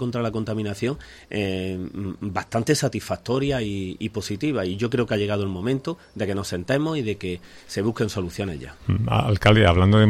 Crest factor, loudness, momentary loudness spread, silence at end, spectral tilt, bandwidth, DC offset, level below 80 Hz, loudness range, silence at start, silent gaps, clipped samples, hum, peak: 18 dB; -24 LUFS; 12 LU; 0 s; -6 dB/octave; 14 kHz; under 0.1%; -44 dBFS; 4 LU; 0 s; none; under 0.1%; none; -4 dBFS